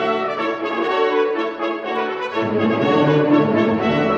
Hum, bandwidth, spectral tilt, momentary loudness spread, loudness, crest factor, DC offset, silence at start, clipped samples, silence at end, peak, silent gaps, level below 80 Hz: none; 7.2 kHz; -7.5 dB/octave; 7 LU; -19 LUFS; 14 dB; under 0.1%; 0 s; under 0.1%; 0 s; -4 dBFS; none; -56 dBFS